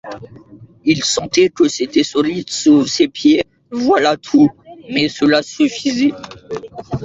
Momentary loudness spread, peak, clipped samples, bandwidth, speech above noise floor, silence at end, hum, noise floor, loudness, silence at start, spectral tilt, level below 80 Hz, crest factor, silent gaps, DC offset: 15 LU; -2 dBFS; under 0.1%; 7.8 kHz; 26 dB; 0 s; none; -41 dBFS; -15 LUFS; 0.05 s; -4 dB/octave; -50 dBFS; 14 dB; none; under 0.1%